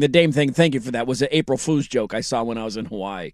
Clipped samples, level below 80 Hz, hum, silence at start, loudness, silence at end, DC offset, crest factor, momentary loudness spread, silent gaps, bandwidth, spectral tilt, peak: under 0.1%; -50 dBFS; none; 0 s; -21 LUFS; 0.05 s; under 0.1%; 18 dB; 11 LU; none; 13 kHz; -5.5 dB/octave; -2 dBFS